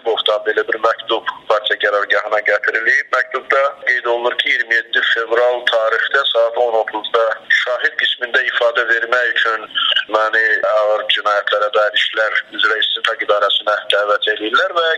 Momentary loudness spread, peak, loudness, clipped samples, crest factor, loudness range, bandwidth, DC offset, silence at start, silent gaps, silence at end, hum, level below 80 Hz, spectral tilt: 3 LU; 0 dBFS; -15 LUFS; under 0.1%; 16 dB; 1 LU; 11 kHz; under 0.1%; 0.05 s; none; 0 s; none; -70 dBFS; -0.5 dB/octave